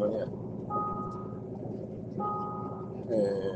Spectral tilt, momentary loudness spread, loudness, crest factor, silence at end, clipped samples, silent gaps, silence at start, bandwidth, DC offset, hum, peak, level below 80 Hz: -9 dB/octave; 10 LU; -35 LUFS; 16 dB; 0 s; under 0.1%; none; 0 s; 8.8 kHz; under 0.1%; none; -18 dBFS; -60 dBFS